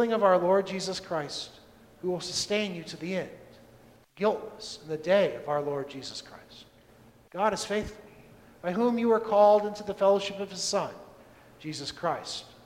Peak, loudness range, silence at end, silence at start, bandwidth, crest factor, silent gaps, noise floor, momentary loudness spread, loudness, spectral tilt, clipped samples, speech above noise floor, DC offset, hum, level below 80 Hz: -10 dBFS; 7 LU; 0.15 s; 0 s; 15.5 kHz; 20 dB; none; -57 dBFS; 17 LU; -28 LUFS; -4 dB/octave; under 0.1%; 29 dB; under 0.1%; none; -62 dBFS